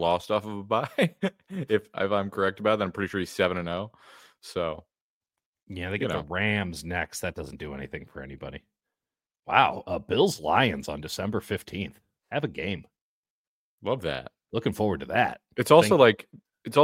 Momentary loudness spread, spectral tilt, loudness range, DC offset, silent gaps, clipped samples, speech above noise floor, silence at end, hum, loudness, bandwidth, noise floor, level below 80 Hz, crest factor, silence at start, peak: 16 LU; -5 dB/octave; 9 LU; under 0.1%; 5.01-5.21 s, 5.46-5.53 s, 5.63-5.67 s, 9.39-9.43 s, 13.01-13.23 s, 13.30-13.78 s; under 0.1%; over 63 dB; 0 s; none; -27 LUFS; 16.5 kHz; under -90 dBFS; -56 dBFS; 24 dB; 0 s; -2 dBFS